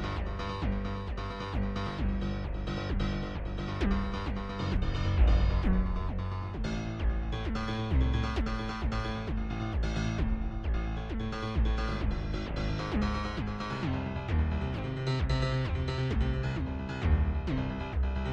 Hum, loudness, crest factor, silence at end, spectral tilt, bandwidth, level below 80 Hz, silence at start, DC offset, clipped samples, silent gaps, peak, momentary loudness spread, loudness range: none; -33 LUFS; 18 dB; 0 s; -7 dB/octave; 7.8 kHz; -34 dBFS; 0 s; under 0.1%; under 0.1%; none; -14 dBFS; 6 LU; 3 LU